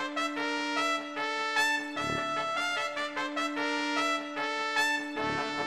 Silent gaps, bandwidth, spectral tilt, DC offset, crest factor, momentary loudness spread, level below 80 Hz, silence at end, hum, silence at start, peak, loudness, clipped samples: none; 15.5 kHz; -2.5 dB/octave; under 0.1%; 18 dB; 5 LU; -66 dBFS; 0 s; none; 0 s; -14 dBFS; -30 LUFS; under 0.1%